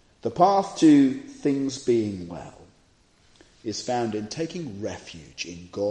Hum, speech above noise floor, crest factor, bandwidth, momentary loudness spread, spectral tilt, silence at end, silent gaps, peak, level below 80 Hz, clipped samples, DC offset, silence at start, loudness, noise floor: none; 36 dB; 20 dB; 9.6 kHz; 20 LU; -5.5 dB/octave; 0 s; none; -4 dBFS; -62 dBFS; under 0.1%; under 0.1%; 0.25 s; -24 LUFS; -60 dBFS